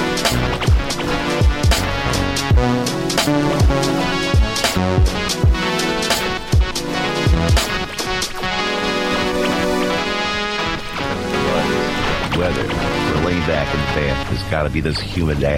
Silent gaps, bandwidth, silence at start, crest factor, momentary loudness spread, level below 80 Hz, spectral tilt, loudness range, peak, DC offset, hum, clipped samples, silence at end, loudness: none; 16.5 kHz; 0 s; 12 dB; 4 LU; -24 dBFS; -4.5 dB/octave; 2 LU; -6 dBFS; under 0.1%; none; under 0.1%; 0 s; -18 LUFS